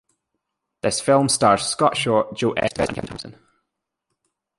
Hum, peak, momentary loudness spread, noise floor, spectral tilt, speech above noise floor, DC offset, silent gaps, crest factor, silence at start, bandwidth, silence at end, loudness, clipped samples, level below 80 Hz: none; -2 dBFS; 15 LU; -80 dBFS; -4 dB/octave; 60 dB; under 0.1%; none; 20 dB; 0.85 s; 11.5 kHz; 1.3 s; -20 LUFS; under 0.1%; -52 dBFS